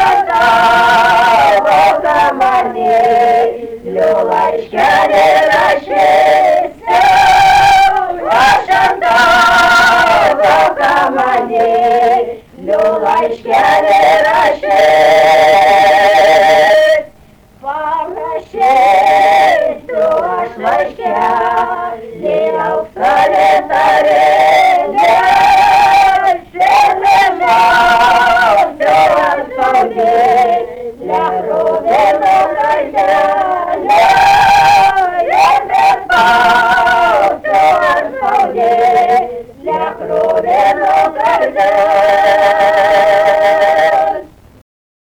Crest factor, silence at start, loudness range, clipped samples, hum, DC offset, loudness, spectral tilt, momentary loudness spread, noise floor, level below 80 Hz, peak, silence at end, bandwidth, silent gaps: 6 dB; 0 s; 4 LU; under 0.1%; none; under 0.1%; -9 LUFS; -3 dB/octave; 8 LU; -42 dBFS; -42 dBFS; -4 dBFS; 0.9 s; 20 kHz; none